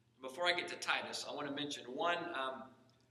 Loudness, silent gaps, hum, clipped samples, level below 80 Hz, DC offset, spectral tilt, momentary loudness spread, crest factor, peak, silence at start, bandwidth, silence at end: -39 LUFS; none; none; under 0.1%; -88 dBFS; under 0.1%; -2.5 dB/octave; 11 LU; 22 dB; -18 dBFS; 0.2 s; 14.5 kHz; 0.35 s